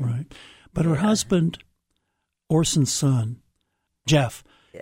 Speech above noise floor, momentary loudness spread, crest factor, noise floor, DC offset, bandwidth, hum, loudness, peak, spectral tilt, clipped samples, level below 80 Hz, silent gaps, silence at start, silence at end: 57 dB; 18 LU; 18 dB; -78 dBFS; under 0.1%; 16 kHz; none; -23 LUFS; -8 dBFS; -5 dB/octave; under 0.1%; -50 dBFS; none; 0 s; 0 s